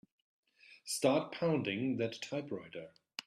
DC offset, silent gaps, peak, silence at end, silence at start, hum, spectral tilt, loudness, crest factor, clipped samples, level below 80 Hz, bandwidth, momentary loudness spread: under 0.1%; none; -16 dBFS; 0.05 s; 0.7 s; none; -5 dB/octave; -36 LUFS; 20 dB; under 0.1%; -78 dBFS; 14 kHz; 17 LU